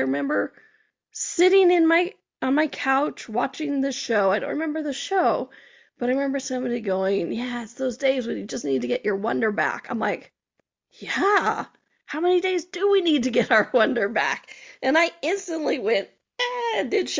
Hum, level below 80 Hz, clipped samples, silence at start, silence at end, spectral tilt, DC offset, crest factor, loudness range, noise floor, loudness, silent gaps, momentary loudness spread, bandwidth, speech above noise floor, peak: none; -68 dBFS; under 0.1%; 0 s; 0 s; -3.5 dB/octave; under 0.1%; 18 dB; 4 LU; -75 dBFS; -23 LUFS; none; 10 LU; 7.6 kHz; 52 dB; -6 dBFS